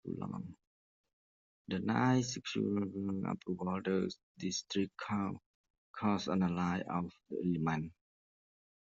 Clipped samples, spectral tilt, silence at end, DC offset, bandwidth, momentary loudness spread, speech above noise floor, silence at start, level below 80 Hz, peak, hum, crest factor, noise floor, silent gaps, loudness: under 0.1%; -5.5 dB/octave; 0.95 s; under 0.1%; 7.6 kHz; 10 LU; over 54 dB; 0.05 s; -72 dBFS; -20 dBFS; none; 18 dB; under -90 dBFS; 0.67-1.04 s, 1.13-1.65 s, 4.23-4.35 s, 5.46-5.64 s, 5.70-5.94 s; -37 LUFS